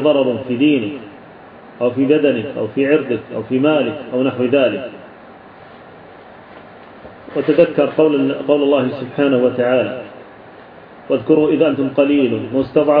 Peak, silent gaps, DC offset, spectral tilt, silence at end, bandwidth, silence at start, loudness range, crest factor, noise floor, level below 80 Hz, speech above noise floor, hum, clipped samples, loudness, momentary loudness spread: 0 dBFS; none; under 0.1%; -10 dB/octave; 0 s; 4.9 kHz; 0 s; 6 LU; 16 dB; -39 dBFS; -58 dBFS; 24 dB; none; under 0.1%; -16 LUFS; 10 LU